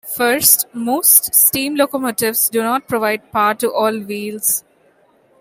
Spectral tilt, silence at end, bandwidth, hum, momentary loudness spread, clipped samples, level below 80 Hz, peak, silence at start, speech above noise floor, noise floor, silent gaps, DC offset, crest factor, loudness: -1.5 dB/octave; 0.8 s; over 20 kHz; none; 9 LU; under 0.1%; -58 dBFS; 0 dBFS; 0.05 s; 38 dB; -54 dBFS; none; under 0.1%; 16 dB; -14 LUFS